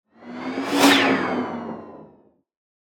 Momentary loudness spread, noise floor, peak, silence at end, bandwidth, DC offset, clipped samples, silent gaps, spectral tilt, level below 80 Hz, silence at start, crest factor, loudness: 21 LU; -56 dBFS; -2 dBFS; 0.8 s; 19.5 kHz; under 0.1%; under 0.1%; none; -3 dB/octave; -68 dBFS; 0.2 s; 22 dB; -20 LUFS